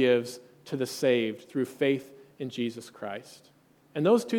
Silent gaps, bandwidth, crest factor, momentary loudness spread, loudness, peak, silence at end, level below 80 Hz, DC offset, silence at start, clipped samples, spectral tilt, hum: none; 18 kHz; 18 dB; 15 LU; -30 LUFS; -10 dBFS; 0 s; -78 dBFS; under 0.1%; 0 s; under 0.1%; -5.5 dB/octave; none